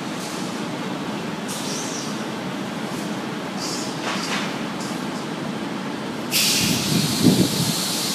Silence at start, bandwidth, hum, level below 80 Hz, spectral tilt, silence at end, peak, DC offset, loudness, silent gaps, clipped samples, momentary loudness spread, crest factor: 0 s; 15.5 kHz; none; -60 dBFS; -3.5 dB/octave; 0 s; -2 dBFS; under 0.1%; -23 LUFS; none; under 0.1%; 11 LU; 22 dB